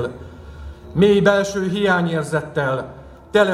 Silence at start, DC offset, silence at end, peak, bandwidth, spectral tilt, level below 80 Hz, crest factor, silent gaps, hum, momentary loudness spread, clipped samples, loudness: 0 s; under 0.1%; 0 s; 0 dBFS; 14.5 kHz; -6 dB/octave; -42 dBFS; 18 dB; none; none; 23 LU; under 0.1%; -19 LUFS